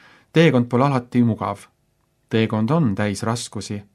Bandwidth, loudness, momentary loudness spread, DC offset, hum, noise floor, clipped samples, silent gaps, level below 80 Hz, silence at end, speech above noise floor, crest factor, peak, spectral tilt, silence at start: 12.5 kHz; -20 LUFS; 12 LU; under 0.1%; none; -66 dBFS; under 0.1%; none; -60 dBFS; 0.1 s; 46 dB; 18 dB; -2 dBFS; -6.5 dB/octave; 0.35 s